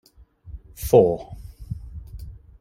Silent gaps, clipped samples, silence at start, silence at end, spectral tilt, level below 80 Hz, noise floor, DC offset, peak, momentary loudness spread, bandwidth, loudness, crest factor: none; under 0.1%; 0.5 s; 0.3 s; -7.5 dB/octave; -40 dBFS; -47 dBFS; under 0.1%; -2 dBFS; 26 LU; 16.5 kHz; -20 LUFS; 22 dB